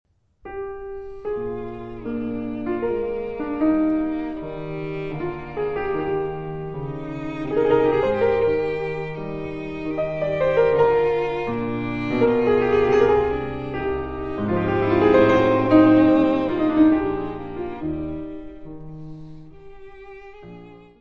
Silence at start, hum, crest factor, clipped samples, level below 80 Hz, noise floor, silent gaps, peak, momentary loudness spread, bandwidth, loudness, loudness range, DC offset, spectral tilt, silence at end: 0.05 s; none; 18 dB; under 0.1%; -44 dBFS; -43 dBFS; none; -4 dBFS; 17 LU; 6.6 kHz; -22 LUFS; 10 LU; 0.6%; -8.5 dB/octave; 0 s